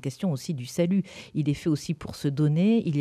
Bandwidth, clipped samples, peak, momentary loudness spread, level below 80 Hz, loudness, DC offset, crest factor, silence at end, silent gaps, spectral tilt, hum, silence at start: 13.5 kHz; under 0.1%; -12 dBFS; 9 LU; -58 dBFS; -27 LUFS; under 0.1%; 14 dB; 0 s; none; -7 dB/octave; none; 0.05 s